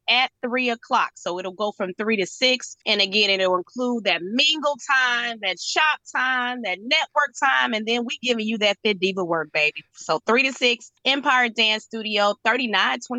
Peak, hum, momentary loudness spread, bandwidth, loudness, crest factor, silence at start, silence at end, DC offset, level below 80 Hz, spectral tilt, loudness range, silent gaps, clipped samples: -4 dBFS; none; 7 LU; 9.4 kHz; -21 LUFS; 18 dB; 0.05 s; 0 s; under 0.1%; -76 dBFS; -2.5 dB/octave; 2 LU; none; under 0.1%